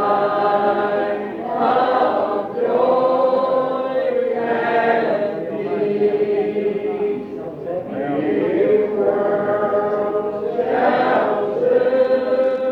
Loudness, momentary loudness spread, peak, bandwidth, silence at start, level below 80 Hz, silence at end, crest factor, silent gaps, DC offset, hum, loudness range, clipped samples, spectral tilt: -19 LUFS; 7 LU; -4 dBFS; 5.4 kHz; 0 s; -60 dBFS; 0 s; 14 dB; none; under 0.1%; none; 2 LU; under 0.1%; -8 dB/octave